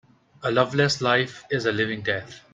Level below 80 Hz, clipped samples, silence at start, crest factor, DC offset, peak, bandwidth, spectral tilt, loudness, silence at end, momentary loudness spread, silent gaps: -62 dBFS; under 0.1%; 0.4 s; 20 dB; under 0.1%; -4 dBFS; 9.4 kHz; -4.5 dB/octave; -24 LUFS; 0.15 s; 7 LU; none